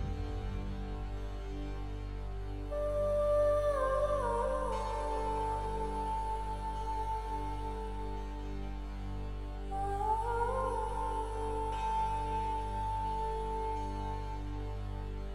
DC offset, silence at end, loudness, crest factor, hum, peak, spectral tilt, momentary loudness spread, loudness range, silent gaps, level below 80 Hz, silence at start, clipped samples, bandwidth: under 0.1%; 0 s; -36 LUFS; 14 dB; 50 Hz at -50 dBFS; -20 dBFS; -6.5 dB/octave; 11 LU; 6 LU; none; -40 dBFS; 0 s; under 0.1%; 11.5 kHz